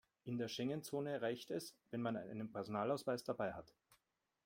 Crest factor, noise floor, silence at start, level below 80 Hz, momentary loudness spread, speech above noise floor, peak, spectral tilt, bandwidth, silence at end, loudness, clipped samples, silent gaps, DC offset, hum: 18 dB; -86 dBFS; 0.25 s; -80 dBFS; 7 LU; 42 dB; -26 dBFS; -5.5 dB/octave; 16.5 kHz; 0.8 s; -44 LUFS; under 0.1%; none; under 0.1%; none